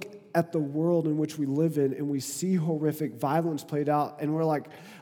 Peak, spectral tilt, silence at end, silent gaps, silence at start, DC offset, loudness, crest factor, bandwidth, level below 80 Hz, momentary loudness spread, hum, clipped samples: -10 dBFS; -7 dB/octave; 0 s; none; 0 s; under 0.1%; -28 LUFS; 18 dB; 18.5 kHz; -82 dBFS; 5 LU; none; under 0.1%